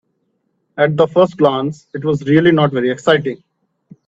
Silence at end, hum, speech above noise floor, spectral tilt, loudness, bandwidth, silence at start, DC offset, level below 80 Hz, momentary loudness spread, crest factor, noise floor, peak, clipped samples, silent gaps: 0.75 s; none; 52 dB; -7 dB/octave; -15 LUFS; 7.8 kHz; 0.75 s; under 0.1%; -56 dBFS; 12 LU; 16 dB; -66 dBFS; 0 dBFS; under 0.1%; none